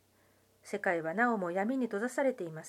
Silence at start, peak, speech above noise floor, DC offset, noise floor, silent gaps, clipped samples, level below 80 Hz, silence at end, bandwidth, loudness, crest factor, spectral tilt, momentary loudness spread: 0.65 s; -16 dBFS; 35 dB; under 0.1%; -68 dBFS; none; under 0.1%; -84 dBFS; 0 s; 15 kHz; -33 LUFS; 18 dB; -6 dB/octave; 4 LU